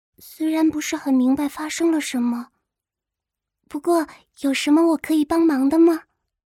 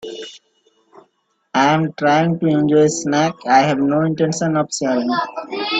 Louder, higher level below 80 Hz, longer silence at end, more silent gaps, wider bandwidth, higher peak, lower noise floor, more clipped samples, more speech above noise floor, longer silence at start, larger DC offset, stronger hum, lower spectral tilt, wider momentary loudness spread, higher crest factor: second, -20 LUFS vs -17 LUFS; about the same, -60 dBFS vs -60 dBFS; first, 0.45 s vs 0 s; neither; first, 15.5 kHz vs 9.2 kHz; second, -8 dBFS vs 0 dBFS; first, -86 dBFS vs -65 dBFS; neither; first, 67 dB vs 49 dB; first, 0.25 s vs 0.05 s; neither; neither; second, -3.5 dB/octave vs -5 dB/octave; about the same, 10 LU vs 9 LU; about the same, 14 dB vs 16 dB